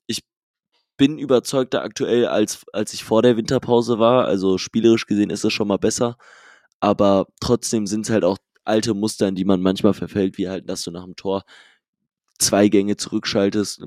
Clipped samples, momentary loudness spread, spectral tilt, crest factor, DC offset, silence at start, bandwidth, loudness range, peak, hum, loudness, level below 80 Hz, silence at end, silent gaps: under 0.1%; 10 LU; -5 dB/octave; 18 dB; under 0.1%; 0.1 s; 15 kHz; 4 LU; -2 dBFS; none; -20 LUFS; -54 dBFS; 0 s; 0.37-0.54 s, 6.74-6.80 s, 11.88-11.93 s